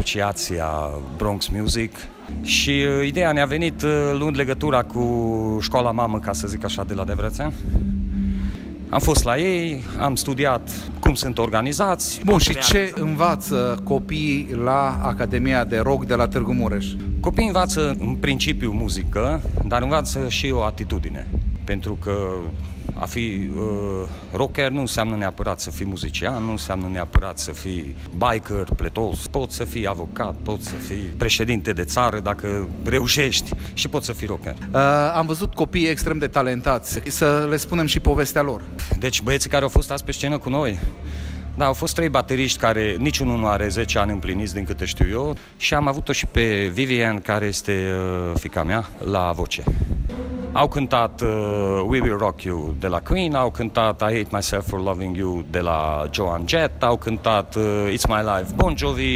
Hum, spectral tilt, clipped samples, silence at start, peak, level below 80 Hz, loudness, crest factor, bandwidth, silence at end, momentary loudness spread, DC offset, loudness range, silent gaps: none; -4.5 dB/octave; under 0.1%; 0 s; -4 dBFS; -30 dBFS; -22 LUFS; 18 dB; 16 kHz; 0 s; 8 LU; under 0.1%; 5 LU; none